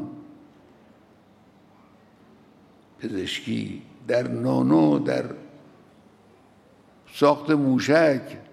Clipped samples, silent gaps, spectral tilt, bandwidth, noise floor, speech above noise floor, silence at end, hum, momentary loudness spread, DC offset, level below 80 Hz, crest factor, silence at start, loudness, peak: under 0.1%; none; -6.5 dB/octave; 13.5 kHz; -55 dBFS; 33 dB; 0.1 s; none; 19 LU; under 0.1%; -68 dBFS; 20 dB; 0 s; -23 LUFS; -4 dBFS